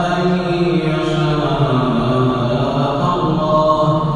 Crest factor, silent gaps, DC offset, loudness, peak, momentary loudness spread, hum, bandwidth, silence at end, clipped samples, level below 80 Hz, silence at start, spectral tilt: 14 dB; none; under 0.1%; -16 LUFS; -2 dBFS; 3 LU; none; 9.8 kHz; 0 s; under 0.1%; -36 dBFS; 0 s; -7.5 dB/octave